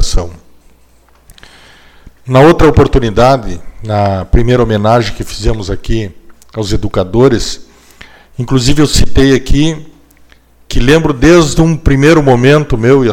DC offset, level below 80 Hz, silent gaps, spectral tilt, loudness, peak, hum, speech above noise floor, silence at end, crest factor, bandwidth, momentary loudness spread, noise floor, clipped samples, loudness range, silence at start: under 0.1%; -20 dBFS; none; -6 dB/octave; -10 LUFS; 0 dBFS; none; 37 dB; 0 s; 10 dB; 16 kHz; 14 LU; -45 dBFS; 0.5%; 4 LU; 0 s